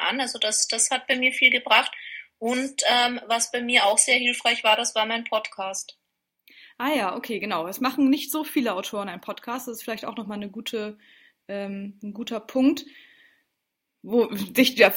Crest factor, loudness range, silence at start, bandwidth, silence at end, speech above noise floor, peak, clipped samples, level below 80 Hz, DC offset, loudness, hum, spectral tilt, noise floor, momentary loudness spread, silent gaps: 24 dB; 10 LU; 0 s; 16.5 kHz; 0 s; 56 dB; 0 dBFS; under 0.1%; -72 dBFS; under 0.1%; -23 LUFS; none; -1.5 dB/octave; -81 dBFS; 16 LU; none